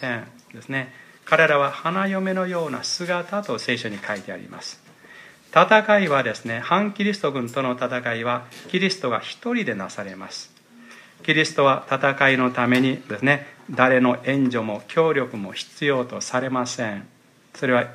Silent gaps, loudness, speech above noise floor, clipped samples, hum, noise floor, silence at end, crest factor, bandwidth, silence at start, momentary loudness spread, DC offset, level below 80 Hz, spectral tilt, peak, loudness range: none; -22 LUFS; 25 dB; under 0.1%; none; -47 dBFS; 0 s; 22 dB; 14.5 kHz; 0 s; 14 LU; under 0.1%; -72 dBFS; -5 dB/octave; 0 dBFS; 6 LU